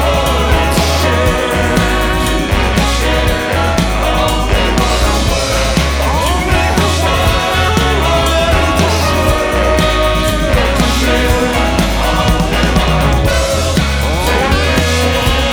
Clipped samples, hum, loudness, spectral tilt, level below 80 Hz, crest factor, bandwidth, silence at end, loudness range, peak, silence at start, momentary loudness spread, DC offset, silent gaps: under 0.1%; none; -12 LUFS; -4.5 dB/octave; -16 dBFS; 12 dB; 18.5 kHz; 0 s; 1 LU; 0 dBFS; 0 s; 2 LU; under 0.1%; none